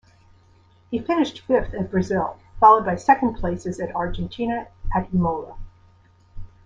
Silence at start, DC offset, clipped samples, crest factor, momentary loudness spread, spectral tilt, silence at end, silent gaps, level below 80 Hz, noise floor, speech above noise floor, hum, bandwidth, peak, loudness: 0.9 s; under 0.1%; under 0.1%; 20 dB; 14 LU; -7 dB/octave; 0.2 s; none; -38 dBFS; -55 dBFS; 34 dB; none; 7.8 kHz; -2 dBFS; -22 LUFS